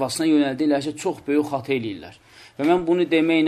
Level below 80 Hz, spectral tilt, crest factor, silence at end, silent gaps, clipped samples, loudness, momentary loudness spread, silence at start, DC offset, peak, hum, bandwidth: -60 dBFS; -5 dB/octave; 14 dB; 0 s; none; under 0.1%; -21 LUFS; 8 LU; 0 s; under 0.1%; -6 dBFS; none; 13.5 kHz